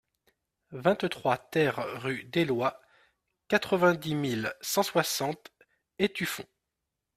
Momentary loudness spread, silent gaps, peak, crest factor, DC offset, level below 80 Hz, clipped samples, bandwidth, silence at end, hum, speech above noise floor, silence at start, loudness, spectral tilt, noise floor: 9 LU; none; -8 dBFS; 22 dB; under 0.1%; -68 dBFS; under 0.1%; 15.5 kHz; 0.75 s; none; 57 dB; 0.7 s; -29 LUFS; -4.5 dB/octave; -85 dBFS